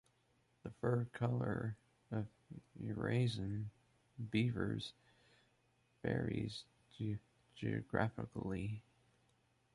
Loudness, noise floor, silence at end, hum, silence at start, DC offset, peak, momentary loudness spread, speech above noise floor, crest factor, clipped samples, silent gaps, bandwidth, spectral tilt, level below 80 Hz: -42 LUFS; -77 dBFS; 0.95 s; none; 0.65 s; under 0.1%; -22 dBFS; 14 LU; 37 dB; 22 dB; under 0.1%; none; 11.5 kHz; -7.5 dB/octave; -64 dBFS